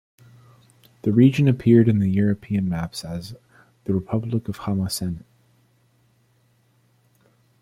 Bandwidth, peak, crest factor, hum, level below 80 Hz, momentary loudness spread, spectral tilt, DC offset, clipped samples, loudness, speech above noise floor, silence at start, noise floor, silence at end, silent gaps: 15.5 kHz; -4 dBFS; 18 dB; none; -54 dBFS; 17 LU; -7.5 dB/octave; under 0.1%; under 0.1%; -21 LUFS; 42 dB; 1.05 s; -62 dBFS; 2.4 s; none